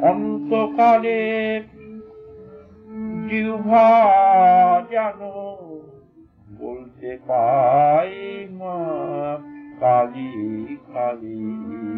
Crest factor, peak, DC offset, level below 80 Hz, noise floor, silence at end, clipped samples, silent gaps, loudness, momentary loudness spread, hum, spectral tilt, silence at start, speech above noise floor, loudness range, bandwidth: 14 dB; -6 dBFS; under 0.1%; -60 dBFS; -50 dBFS; 0 s; under 0.1%; none; -18 LUFS; 21 LU; none; -8.5 dB/octave; 0 s; 31 dB; 7 LU; 5.2 kHz